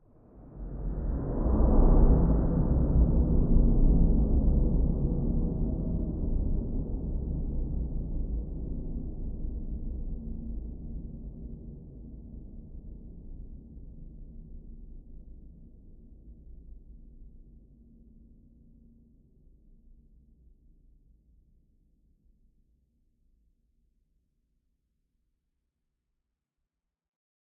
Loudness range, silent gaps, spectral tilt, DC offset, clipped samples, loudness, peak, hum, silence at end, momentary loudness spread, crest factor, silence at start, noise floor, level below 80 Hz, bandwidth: 25 LU; none; -15 dB/octave; under 0.1%; under 0.1%; -30 LUFS; -10 dBFS; none; 10.05 s; 24 LU; 20 dB; 0.35 s; -86 dBFS; -32 dBFS; 1.7 kHz